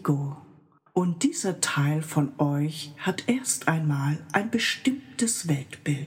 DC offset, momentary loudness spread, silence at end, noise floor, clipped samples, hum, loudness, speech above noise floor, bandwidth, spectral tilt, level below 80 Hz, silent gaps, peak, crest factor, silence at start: under 0.1%; 6 LU; 0 s; -56 dBFS; under 0.1%; none; -26 LUFS; 30 dB; 16.5 kHz; -4.5 dB/octave; -72 dBFS; none; -6 dBFS; 20 dB; 0 s